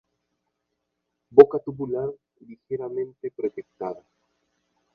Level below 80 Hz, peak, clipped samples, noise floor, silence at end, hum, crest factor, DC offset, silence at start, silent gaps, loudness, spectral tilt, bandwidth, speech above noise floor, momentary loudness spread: -66 dBFS; 0 dBFS; under 0.1%; -80 dBFS; 1 s; none; 24 dB; under 0.1%; 1.35 s; none; -22 LUFS; -9.5 dB/octave; 4.5 kHz; 57 dB; 19 LU